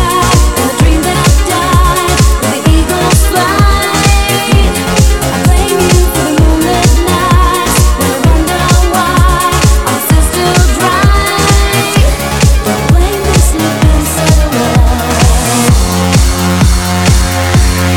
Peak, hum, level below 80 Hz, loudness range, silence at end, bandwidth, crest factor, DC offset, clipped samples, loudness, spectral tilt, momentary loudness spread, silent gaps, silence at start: 0 dBFS; none; -12 dBFS; 1 LU; 0 s; 18.5 kHz; 8 dB; 0.7%; 0.5%; -9 LUFS; -4.5 dB/octave; 2 LU; none; 0 s